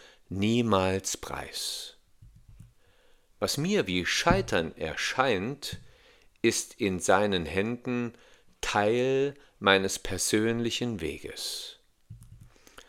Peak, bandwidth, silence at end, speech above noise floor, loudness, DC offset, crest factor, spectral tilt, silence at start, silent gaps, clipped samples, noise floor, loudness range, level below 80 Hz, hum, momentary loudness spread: -4 dBFS; 17 kHz; 0.05 s; 32 dB; -28 LUFS; under 0.1%; 26 dB; -4 dB/octave; 0.3 s; none; under 0.1%; -61 dBFS; 4 LU; -52 dBFS; none; 11 LU